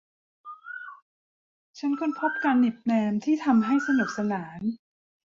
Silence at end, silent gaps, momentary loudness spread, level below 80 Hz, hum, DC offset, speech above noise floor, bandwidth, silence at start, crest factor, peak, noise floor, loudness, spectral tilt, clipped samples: 0.55 s; 1.02-1.74 s; 18 LU; -70 dBFS; none; under 0.1%; over 65 dB; 7.4 kHz; 0.45 s; 16 dB; -10 dBFS; under -90 dBFS; -26 LUFS; -6.5 dB/octave; under 0.1%